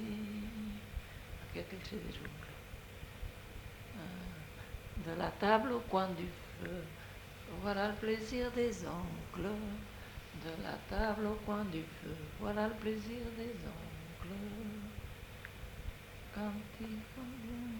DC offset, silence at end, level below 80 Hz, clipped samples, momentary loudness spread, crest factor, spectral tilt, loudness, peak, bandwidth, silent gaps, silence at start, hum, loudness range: under 0.1%; 0 s; -52 dBFS; under 0.1%; 14 LU; 28 dB; -6 dB/octave; -42 LUFS; -14 dBFS; 19 kHz; none; 0 s; none; 10 LU